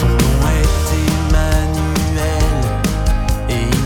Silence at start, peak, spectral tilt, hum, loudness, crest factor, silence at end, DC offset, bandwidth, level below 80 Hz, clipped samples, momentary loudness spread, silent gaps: 0 s; 0 dBFS; -5.5 dB/octave; none; -16 LUFS; 14 dB; 0 s; under 0.1%; 18 kHz; -16 dBFS; under 0.1%; 4 LU; none